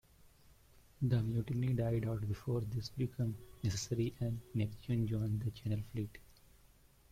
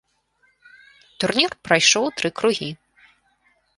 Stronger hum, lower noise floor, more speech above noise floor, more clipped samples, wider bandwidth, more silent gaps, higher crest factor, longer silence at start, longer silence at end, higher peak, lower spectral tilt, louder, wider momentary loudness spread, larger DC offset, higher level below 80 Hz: neither; about the same, -65 dBFS vs -64 dBFS; second, 28 dB vs 44 dB; neither; first, 15.5 kHz vs 11.5 kHz; neither; second, 16 dB vs 22 dB; second, 1 s vs 1.2 s; second, 0.9 s vs 1.05 s; second, -22 dBFS vs -2 dBFS; first, -7 dB/octave vs -2 dB/octave; second, -38 LUFS vs -19 LUFS; second, 6 LU vs 13 LU; neither; about the same, -58 dBFS vs -62 dBFS